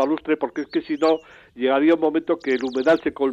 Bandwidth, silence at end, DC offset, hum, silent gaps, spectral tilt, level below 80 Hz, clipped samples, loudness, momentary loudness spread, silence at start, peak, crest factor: 7.8 kHz; 0 s; under 0.1%; none; none; -5.5 dB/octave; -62 dBFS; under 0.1%; -21 LUFS; 8 LU; 0 s; -8 dBFS; 14 dB